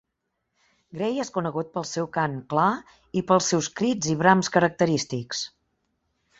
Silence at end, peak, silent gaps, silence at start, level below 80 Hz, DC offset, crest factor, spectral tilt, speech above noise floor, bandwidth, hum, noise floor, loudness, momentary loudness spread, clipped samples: 0.9 s; -4 dBFS; none; 0.95 s; -62 dBFS; under 0.1%; 22 dB; -4.5 dB/octave; 55 dB; 8 kHz; none; -79 dBFS; -24 LUFS; 11 LU; under 0.1%